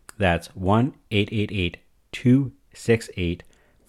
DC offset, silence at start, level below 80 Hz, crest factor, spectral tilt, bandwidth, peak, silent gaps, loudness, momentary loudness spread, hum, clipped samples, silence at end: under 0.1%; 0.2 s; -40 dBFS; 18 dB; -6.5 dB/octave; 13 kHz; -6 dBFS; none; -24 LUFS; 11 LU; none; under 0.1%; 0.5 s